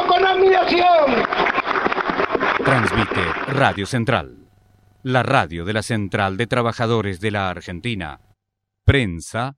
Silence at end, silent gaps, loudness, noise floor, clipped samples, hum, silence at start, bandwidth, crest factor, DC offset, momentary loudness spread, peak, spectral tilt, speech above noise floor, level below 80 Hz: 0.05 s; none; -19 LUFS; -79 dBFS; under 0.1%; none; 0 s; 13 kHz; 18 dB; under 0.1%; 11 LU; 0 dBFS; -6 dB/octave; 59 dB; -40 dBFS